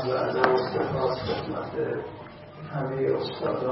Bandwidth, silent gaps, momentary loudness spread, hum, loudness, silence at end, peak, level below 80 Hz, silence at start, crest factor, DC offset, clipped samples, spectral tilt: 5.8 kHz; none; 15 LU; none; -27 LUFS; 0 s; -4 dBFS; -56 dBFS; 0 s; 24 dB; under 0.1%; under 0.1%; -10 dB/octave